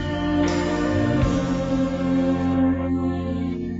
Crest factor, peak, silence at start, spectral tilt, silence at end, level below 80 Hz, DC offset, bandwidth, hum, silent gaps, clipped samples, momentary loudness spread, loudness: 12 dB; -10 dBFS; 0 s; -7 dB/octave; 0 s; -36 dBFS; under 0.1%; 8 kHz; none; none; under 0.1%; 4 LU; -22 LUFS